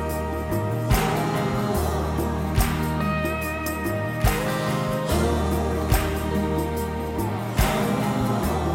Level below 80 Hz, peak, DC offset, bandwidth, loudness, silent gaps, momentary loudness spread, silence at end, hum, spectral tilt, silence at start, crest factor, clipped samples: -30 dBFS; -6 dBFS; under 0.1%; 16.5 kHz; -24 LUFS; none; 4 LU; 0 s; none; -6 dB/octave; 0 s; 16 dB; under 0.1%